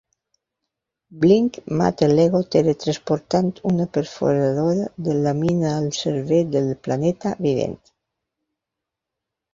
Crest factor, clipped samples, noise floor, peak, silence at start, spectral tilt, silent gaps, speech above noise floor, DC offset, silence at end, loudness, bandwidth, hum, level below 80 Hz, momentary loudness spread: 18 dB; under 0.1%; -84 dBFS; -4 dBFS; 1.1 s; -7 dB/octave; none; 65 dB; under 0.1%; 1.8 s; -20 LUFS; 7.6 kHz; none; -56 dBFS; 7 LU